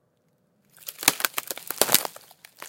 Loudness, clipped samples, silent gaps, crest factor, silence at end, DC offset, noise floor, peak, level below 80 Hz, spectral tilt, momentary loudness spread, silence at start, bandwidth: -23 LUFS; under 0.1%; none; 28 dB; 0 s; under 0.1%; -68 dBFS; 0 dBFS; -78 dBFS; 0 dB/octave; 17 LU; 0.85 s; 17.5 kHz